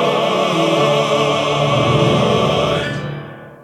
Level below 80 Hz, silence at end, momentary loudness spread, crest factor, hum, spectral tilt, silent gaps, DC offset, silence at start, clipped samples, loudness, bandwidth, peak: -44 dBFS; 0.1 s; 11 LU; 14 dB; none; -5.5 dB/octave; none; under 0.1%; 0 s; under 0.1%; -15 LUFS; 14 kHz; -2 dBFS